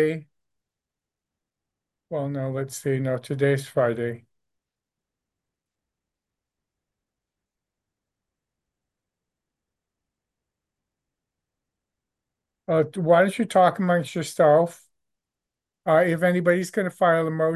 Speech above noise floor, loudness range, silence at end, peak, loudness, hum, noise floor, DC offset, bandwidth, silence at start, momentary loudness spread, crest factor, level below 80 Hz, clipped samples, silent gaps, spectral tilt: 66 dB; 10 LU; 0 s; -6 dBFS; -23 LUFS; none; -88 dBFS; under 0.1%; 12.5 kHz; 0 s; 11 LU; 20 dB; -72 dBFS; under 0.1%; none; -6.5 dB/octave